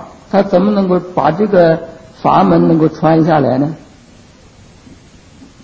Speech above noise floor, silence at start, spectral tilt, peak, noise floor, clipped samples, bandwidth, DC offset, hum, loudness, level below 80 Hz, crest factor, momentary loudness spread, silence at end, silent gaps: 31 dB; 0 s; -9 dB/octave; 0 dBFS; -41 dBFS; under 0.1%; 8 kHz; under 0.1%; none; -12 LUFS; -46 dBFS; 14 dB; 8 LU; 1.85 s; none